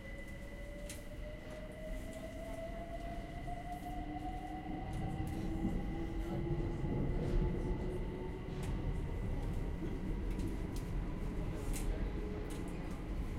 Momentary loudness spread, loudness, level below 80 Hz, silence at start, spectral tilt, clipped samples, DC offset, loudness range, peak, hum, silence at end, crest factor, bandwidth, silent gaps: 9 LU; -42 LUFS; -42 dBFS; 0 s; -7 dB/octave; under 0.1%; under 0.1%; 7 LU; -24 dBFS; none; 0 s; 16 dB; 16 kHz; none